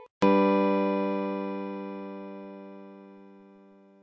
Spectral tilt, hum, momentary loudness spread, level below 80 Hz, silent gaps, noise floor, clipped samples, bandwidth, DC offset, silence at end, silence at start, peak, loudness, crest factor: -8 dB/octave; none; 23 LU; -70 dBFS; 0.11-0.21 s; -55 dBFS; under 0.1%; 7.8 kHz; under 0.1%; 0.65 s; 0 s; -10 dBFS; -27 LUFS; 20 dB